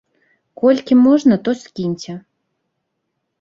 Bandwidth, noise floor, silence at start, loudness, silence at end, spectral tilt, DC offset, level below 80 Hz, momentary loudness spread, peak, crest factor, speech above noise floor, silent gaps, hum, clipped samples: 7.4 kHz; -74 dBFS; 0.6 s; -15 LUFS; 1.2 s; -7 dB/octave; under 0.1%; -60 dBFS; 17 LU; -2 dBFS; 16 dB; 59 dB; none; none; under 0.1%